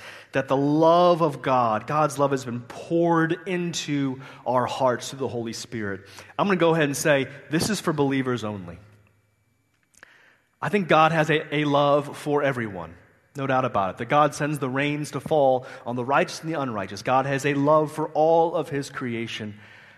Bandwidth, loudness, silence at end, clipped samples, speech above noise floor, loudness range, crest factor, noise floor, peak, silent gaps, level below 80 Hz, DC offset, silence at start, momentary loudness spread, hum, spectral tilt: 13.5 kHz; -23 LUFS; 0.3 s; under 0.1%; 45 dB; 4 LU; 20 dB; -68 dBFS; -4 dBFS; none; -62 dBFS; under 0.1%; 0 s; 13 LU; none; -5.5 dB/octave